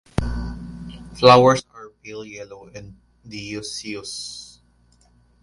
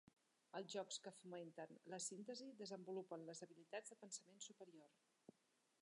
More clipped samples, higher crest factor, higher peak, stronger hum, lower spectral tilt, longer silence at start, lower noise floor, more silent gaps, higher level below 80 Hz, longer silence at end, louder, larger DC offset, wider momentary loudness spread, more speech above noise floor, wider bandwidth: neither; about the same, 22 dB vs 20 dB; first, 0 dBFS vs -36 dBFS; first, 60 Hz at -55 dBFS vs none; first, -5 dB/octave vs -3 dB/octave; second, 0.2 s vs 0.55 s; second, -58 dBFS vs -84 dBFS; neither; first, -38 dBFS vs under -90 dBFS; first, 1 s vs 0.5 s; first, -19 LUFS vs -54 LUFS; neither; first, 25 LU vs 8 LU; first, 38 dB vs 29 dB; about the same, 11.5 kHz vs 11 kHz